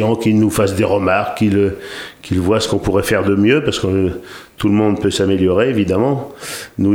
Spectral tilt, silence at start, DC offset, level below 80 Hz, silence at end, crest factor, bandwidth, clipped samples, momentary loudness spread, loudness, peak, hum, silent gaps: -6 dB/octave; 0 s; under 0.1%; -40 dBFS; 0 s; 14 dB; 17.5 kHz; under 0.1%; 12 LU; -15 LUFS; 0 dBFS; none; none